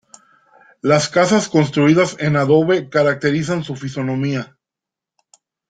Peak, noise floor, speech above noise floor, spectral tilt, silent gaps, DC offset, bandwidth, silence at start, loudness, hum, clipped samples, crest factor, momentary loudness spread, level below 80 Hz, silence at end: -2 dBFS; -86 dBFS; 70 dB; -5.5 dB/octave; none; under 0.1%; 9.4 kHz; 0.85 s; -17 LUFS; none; under 0.1%; 16 dB; 10 LU; -56 dBFS; 1.25 s